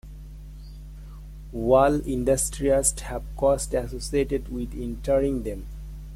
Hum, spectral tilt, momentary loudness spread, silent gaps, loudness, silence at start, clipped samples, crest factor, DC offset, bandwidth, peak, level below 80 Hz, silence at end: none; -5 dB/octave; 22 LU; none; -24 LUFS; 0.05 s; under 0.1%; 18 dB; under 0.1%; 16 kHz; -8 dBFS; -36 dBFS; 0 s